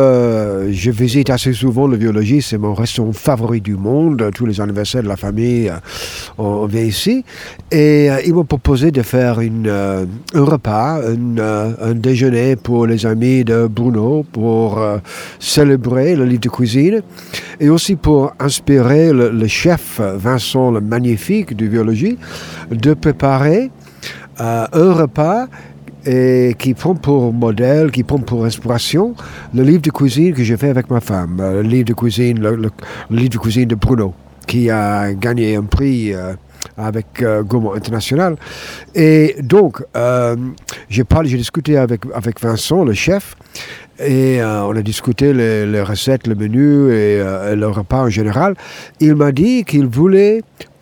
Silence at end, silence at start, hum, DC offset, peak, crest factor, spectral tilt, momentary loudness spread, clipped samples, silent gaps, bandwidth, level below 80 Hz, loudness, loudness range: 0.15 s; 0 s; none; 0.1%; 0 dBFS; 14 dB; -6.5 dB/octave; 10 LU; under 0.1%; none; over 20 kHz; -36 dBFS; -14 LUFS; 3 LU